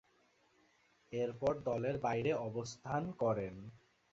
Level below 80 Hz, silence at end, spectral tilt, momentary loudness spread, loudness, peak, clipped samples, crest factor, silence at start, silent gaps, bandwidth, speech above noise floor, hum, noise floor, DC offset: -66 dBFS; 0.35 s; -6 dB/octave; 10 LU; -38 LUFS; -22 dBFS; under 0.1%; 18 dB; 1.1 s; none; 7.6 kHz; 35 dB; none; -73 dBFS; under 0.1%